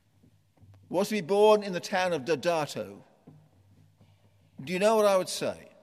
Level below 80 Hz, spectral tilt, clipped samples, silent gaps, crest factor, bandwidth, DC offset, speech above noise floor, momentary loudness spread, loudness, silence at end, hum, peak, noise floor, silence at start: -78 dBFS; -4.5 dB/octave; under 0.1%; none; 18 dB; 15 kHz; under 0.1%; 37 dB; 13 LU; -27 LUFS; 0.2 s; none; -10 dBFS; -64 dBFS; 0.9 s